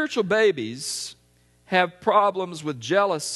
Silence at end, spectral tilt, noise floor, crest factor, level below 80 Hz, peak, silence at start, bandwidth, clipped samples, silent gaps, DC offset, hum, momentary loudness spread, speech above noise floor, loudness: 0 s; -3.5 dB/octave; -60 dBFS; 20 dB; -66 dBFS; -4 dBFS; 0 s; 12.5 kHz; under 0.1%; none; under 0.1%; 60 Hz at -50 dBFS; 11 LU; 38 dB; -23 LUFS